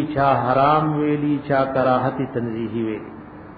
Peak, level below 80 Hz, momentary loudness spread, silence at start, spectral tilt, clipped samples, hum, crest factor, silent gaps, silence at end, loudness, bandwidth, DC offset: -6 dBFS; -50 dBFS; 10 LU; 0 s; -10.5 dB/octave; under 0.1%; none; 14 dB; none; 0 s; -20 LUFS; 5 kHz; under 0.1%